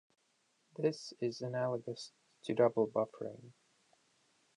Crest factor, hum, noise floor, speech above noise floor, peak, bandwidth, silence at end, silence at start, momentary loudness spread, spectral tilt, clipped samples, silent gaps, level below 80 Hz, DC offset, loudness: 22 dB; none; -77 dBFS; 41 dB; -16 dBFS; 10.5 kHz; 1.05 s; 0.8 s; 17 LU; -6 dB/octave; under 0.1%; none; -84 dBFS; under 0.1%; -36 LUFS